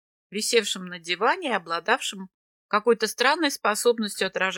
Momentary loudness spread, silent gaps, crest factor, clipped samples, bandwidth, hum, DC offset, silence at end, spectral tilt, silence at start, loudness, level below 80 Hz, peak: 8 LU; 2.34-2.69 s; 18 dB; under 0.1%; 17.5 kHz; none; under 0.1%; 0 s; -2 dB/octave; 0.3 s; -24 LUFS; -78 dBFS; -6 dBFS